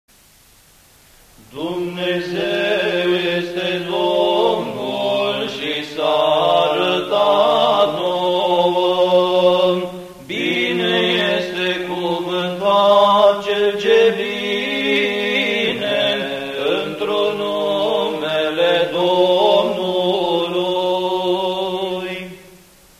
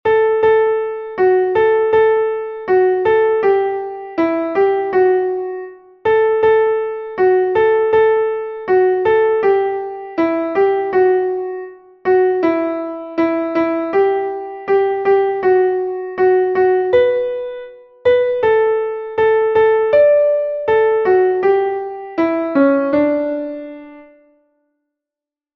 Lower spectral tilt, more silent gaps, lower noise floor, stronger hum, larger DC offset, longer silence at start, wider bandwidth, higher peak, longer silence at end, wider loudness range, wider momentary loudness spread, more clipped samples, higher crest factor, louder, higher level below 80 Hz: second, -5 dB/octave vs -7.5 dB/octave; neither; second, -50 dBFS vs -88 dBFS; neither; neither; first, 1.5 s vs 0.05 s; first, 15.5 kHz vs 5.4 kHz; about the same, -2 dBFS vs -2 dBFS; second, 0.5 s vs 1.55 s; about the same, 4 LU vs 3 LU; second, 8 LU vs 11 LU; neither; about the same, 16 dB vs 14 dB; about the same, -17 LUFS vs -15 LUFS; about the same, -56 dBFS vs -54 dBFS